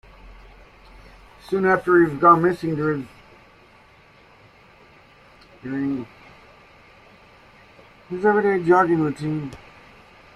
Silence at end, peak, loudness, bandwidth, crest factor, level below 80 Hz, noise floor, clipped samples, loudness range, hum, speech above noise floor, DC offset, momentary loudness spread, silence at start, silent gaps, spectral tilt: 0.8 s; -2 dBFS; -20 LUFS; 11.5 kHz; 22 dB; -54 dBFS; -52 dBFS; under 0.1%; 14 LU; none; 32 dB; under 0.1%; 21 LU; 0.25 s; none; -8 dB/octave